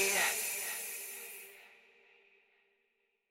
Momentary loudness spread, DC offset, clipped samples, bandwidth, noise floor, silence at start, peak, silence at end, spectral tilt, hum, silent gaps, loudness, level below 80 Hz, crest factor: 21 LU; under 0.1%; under 0.1%; 16.5 kHz; -80 dBFS; 0 s; -18 dBFS; 1.55 s; 1 dB/octave; none; none; -35 LUFS; -80 dBFS; 22 dB